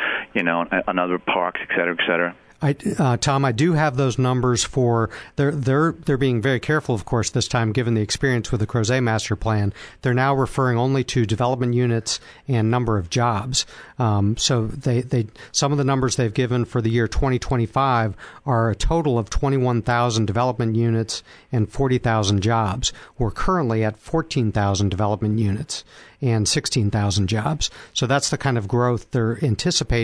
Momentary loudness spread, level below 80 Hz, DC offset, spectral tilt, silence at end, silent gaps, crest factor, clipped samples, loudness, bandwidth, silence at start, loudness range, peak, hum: 5 LU; -36 dBFS; under 0.1%; -5 dB/octave; 0 s; none; 16 dB; under 0.1%; -21 LUFS; 11 kHz; 0 s; 2 LU; -4 dBFS; none